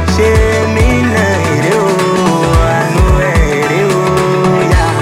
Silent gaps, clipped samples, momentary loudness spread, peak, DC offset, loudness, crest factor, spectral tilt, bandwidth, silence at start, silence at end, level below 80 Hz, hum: none; under 0.1%; 1 LU; 0 dBFS; under 0.1%; -11 LUFS; 10 dB; -6 dB/octave; 16 kHz; 0 s; 0 s; -18 dBFS; none